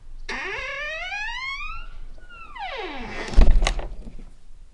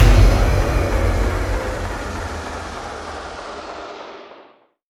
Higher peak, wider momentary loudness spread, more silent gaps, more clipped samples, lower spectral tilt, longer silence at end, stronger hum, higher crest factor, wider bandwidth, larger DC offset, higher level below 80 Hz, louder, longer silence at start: about the same, 0 dBFS vs 0 dBFS; first, 23 LU vs 17 LU; neither; neither; second, -4.5 dB/octave vs -6 dB/octave; second, 0.1 s vs 0.5 s; neither; about the same, 22 dB vs 18 dB; second, 10.5 kHz vs 13.5 kHz; neither; about the same, -24 dBFS vs -20 dBFS; second, -27 LUFS vs -21 LUFS; about the same, 0 s vs 0 s